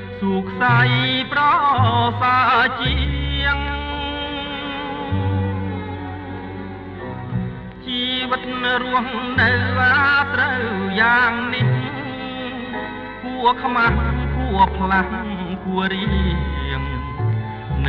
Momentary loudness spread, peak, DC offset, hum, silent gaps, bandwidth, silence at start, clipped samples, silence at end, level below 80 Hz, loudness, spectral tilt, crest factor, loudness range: 13 LU; -2 dBFS; under 0.1%; none; none; 6 kHz; 0 s; under 0.1%; 0 s; -30 dBFS; -19 LUFS; -8 dB/octave; 18 dB; 8 LU